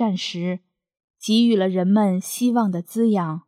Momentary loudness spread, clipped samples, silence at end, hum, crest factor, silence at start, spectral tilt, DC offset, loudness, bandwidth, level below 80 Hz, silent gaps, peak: 10 LU; under 0.1%; 0.1 s; none; 14 dB; 0 s; -6 dB/octave; under 0.1%; -20 LUFS; 15 kHz; -78 dBFS; 1.04-1.14 s; -6 dBFS